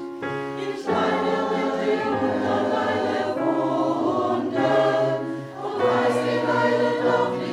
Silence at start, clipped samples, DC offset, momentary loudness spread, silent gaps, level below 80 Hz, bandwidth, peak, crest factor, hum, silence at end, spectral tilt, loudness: 0 s; under 0.1%; under 0.1%; 8 LU; none; -66 dBFS; 12 kHz; -8 dBFS; 14 dB; none; 0 s; -6 dB/octave; -23 LUFS